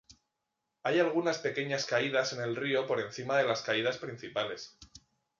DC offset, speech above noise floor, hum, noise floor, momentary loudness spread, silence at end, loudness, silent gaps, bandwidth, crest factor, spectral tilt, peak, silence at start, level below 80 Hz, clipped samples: under 0.1%; 53 dB; none; -85 dBFS; 9 LU; 0.4 s; -32 LUFS; none; 7.6 kHz; 18 dB; -4 dB/octave; -14 dBFS; 0.1 s; -72 dBFS; under 0.1%